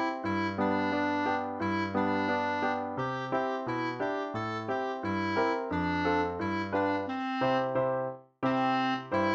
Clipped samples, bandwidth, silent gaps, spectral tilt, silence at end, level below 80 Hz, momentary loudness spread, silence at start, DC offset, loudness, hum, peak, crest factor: under 0.1%; 7.8 kHz; none; -6.5 dB/octave; 0 s; -62 dBFS; 5 LU; 0 s; under 0.1%; -31 LUFS; none; -16 dBFS; 16 dB